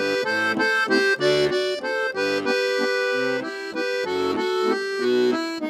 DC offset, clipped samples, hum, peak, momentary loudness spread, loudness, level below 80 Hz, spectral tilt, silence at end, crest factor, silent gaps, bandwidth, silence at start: under 0.1%; under 0.1%; none; -8 dBFS; 6 LU; -22 LUFS; -64 dBFS; -3.5 dB/octave; 0 s; 14 dB; none; 13.5 kHz; 0 s